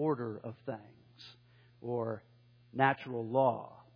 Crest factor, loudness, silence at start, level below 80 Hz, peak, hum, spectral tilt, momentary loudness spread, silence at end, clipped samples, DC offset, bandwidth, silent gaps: 24 dB; -35 LUFS; 0 s; -80 dBFS; -12 dBFS; none; -9 dB/octave; 23 LU; 0.15 s; under 0.1%; under 0.1%; 5.2 kHz; none